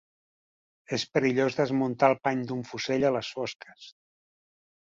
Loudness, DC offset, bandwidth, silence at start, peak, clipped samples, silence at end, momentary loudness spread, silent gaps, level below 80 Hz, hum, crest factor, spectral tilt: -27 LUFS; under 0.1%; 7.6 kHz; 0.9 s; -8 dBFS; under 0.1%; 0.95 s; 11 LU; 3.56-3.60 s; -68 dBFS; none; 22 dB; -5.5 dB/octave